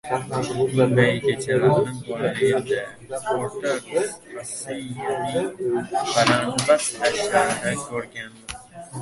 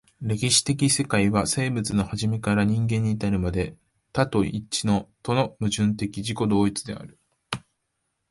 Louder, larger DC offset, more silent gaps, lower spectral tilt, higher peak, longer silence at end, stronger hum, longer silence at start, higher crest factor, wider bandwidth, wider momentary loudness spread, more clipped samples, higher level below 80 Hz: about the same, -23 LUFS vs -24 LUFS; neither; neither; about the same, -4.5 dB/octave vs -4.5 dB/octave; first, -2 dBFS vs -6 dBFS; second, 0 s vs 0.7 s; neither; second, 0.05 s vs 0.2 s; about the same, 22 dB vs 18 dB; about the same, 11.5 kHz vs 11.5 kHz; about the same, 14 LU vs 12 LU; neither; second, -56 dBFS vs -46 dBFS